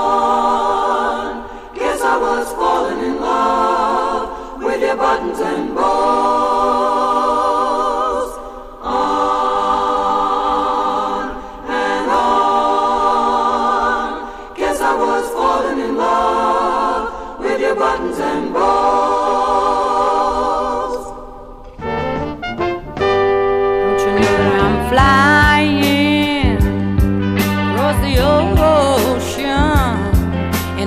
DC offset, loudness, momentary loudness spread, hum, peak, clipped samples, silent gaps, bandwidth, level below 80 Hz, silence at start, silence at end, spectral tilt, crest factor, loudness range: under 0.1%; -16 LUFS; 9 LU; none; 0 dBFS; under 0.1%; none; 15.5 kHz; -28 dBFS; 0 s; 0 s; -5.5 dB/octave; 14 dB; 4 LU